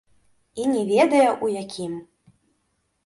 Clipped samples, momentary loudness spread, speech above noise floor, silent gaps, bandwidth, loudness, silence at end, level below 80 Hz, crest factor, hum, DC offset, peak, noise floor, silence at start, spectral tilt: under 0.1%; 17 LU; 51 dB; none; 11.5 kHz; -22 LUFS; 1.05 s; -66 dBFS; 18 dB; none; under 0.1%; -6 dBFS; -71 dBFS; 0.55 s; -5 dB/octave